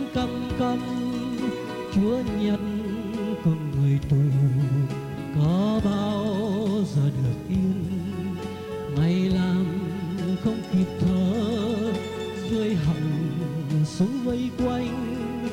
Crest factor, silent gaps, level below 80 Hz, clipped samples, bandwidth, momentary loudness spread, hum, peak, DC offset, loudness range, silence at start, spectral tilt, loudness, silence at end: 14 dB; none; -46 dBFS; under 0.1%; 15.5 kHz; 7 LU; none; -10 dBFS; under 0.1%; 2 LU; 0 s; -8 dB/octave; -25 LUFS; 0 s